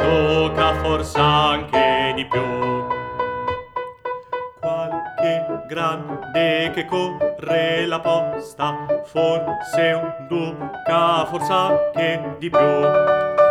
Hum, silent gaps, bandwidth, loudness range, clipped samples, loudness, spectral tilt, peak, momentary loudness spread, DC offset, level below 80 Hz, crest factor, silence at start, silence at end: none; none; 13.5 kHz; 6 LU; under 0.1%; -20 LUFS; -5.5 dB/octave; -2 dBFS; 10 LU; under 0.1%; -42 dBFS; 18 dB; 0 s; 0 s